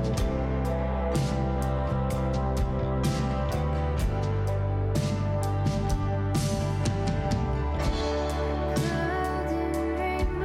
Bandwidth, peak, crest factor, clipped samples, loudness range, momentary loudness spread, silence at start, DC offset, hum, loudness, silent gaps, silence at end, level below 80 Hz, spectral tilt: 15.5 kHz; -16 dBFS; 12 dB; under 0.1%; 0 LU; 1 LU; 0 s; under 0.1%; none; -28 LUFS; none; 0 s; -32 dBFS; -6.5 dB/octave